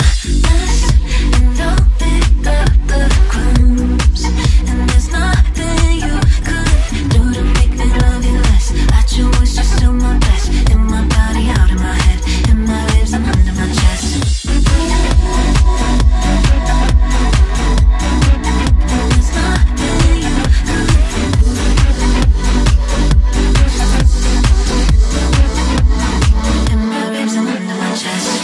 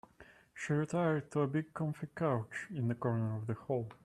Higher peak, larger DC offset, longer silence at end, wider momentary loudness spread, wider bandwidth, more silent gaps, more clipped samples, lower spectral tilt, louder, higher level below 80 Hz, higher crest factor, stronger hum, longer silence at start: first, 0 dBFS vs -20 dBFS; neither; about the same, 0 s vs 0.1 s; second, 2 LU vs 7 LU; about the same, 12 kHz vs 11.5 kHz; neither; neither; second, -5 dB/octave vs -8 dB/octave; first, -14 LUFS vs -36 LUFS; first, -12 dBFS vs -72 dBFS; second, 10 dB vs 16 dB; neither; second, 0 s vs 0.2 s